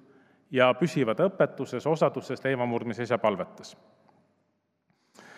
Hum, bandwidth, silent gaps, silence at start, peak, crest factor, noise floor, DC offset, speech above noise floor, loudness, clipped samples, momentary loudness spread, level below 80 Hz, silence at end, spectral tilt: none; 12.5 kHz; none; 0.5 s; -6 dBFS; 22 dB; -74 dBFS; under 0.1%; 48 dB; -27 LUFS; under 0.1%; 10 LU; -82 dBFS; 0.05 s; -6.5 dB/octave